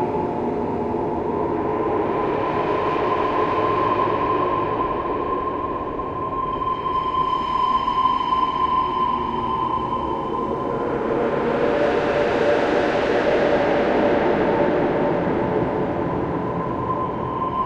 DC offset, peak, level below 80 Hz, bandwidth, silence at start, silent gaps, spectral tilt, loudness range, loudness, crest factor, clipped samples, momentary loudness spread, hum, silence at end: under 0.1%; -6 dBFS; -44 dBFS; 8.8 kHz; 0 s; none; -7.5 dB/octave; 3 LU; -21 LUFS; 14 dB; under 0.1%; 5 LU; none; 0 s